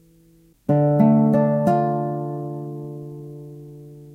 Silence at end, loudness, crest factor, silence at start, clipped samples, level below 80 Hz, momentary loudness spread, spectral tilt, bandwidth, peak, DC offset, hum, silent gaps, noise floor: 0 s; -20 LUFS; 16 dB; 0.7 s; under 0.1%; -60 dBFS; 23 LU; -10.5 dB/octave; 7.8 kHz; -4 dBFS; under 0.1%; none; none; -54 dBFS